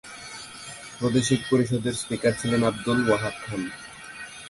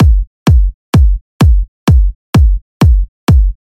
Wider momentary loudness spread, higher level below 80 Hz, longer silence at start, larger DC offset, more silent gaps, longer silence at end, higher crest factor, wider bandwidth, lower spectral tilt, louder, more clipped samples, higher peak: first, 16 LU vs 3 LU; second, -54 dBFS vs -10 dBFS; about the same, 0.05 s vs 0 s; neither; second, none vs 0.27-0.46 s, 0.74-0.93 s, 1.21-1.40 s, 1.68-1.87 s, 2.15-2.33 s, 2.62-2.80 s, 3.08-3.27 s; second, 0 s vs 0.25 s; first, 18 dB vs 8 dB; second, 11.5 kHz vs 14 kHz; second, -5 dB/octave vs -7.5 dB/octave; second, -25 LUFS vs -12 LUFS; neither; second, -8 dBFS vs 0 dBFS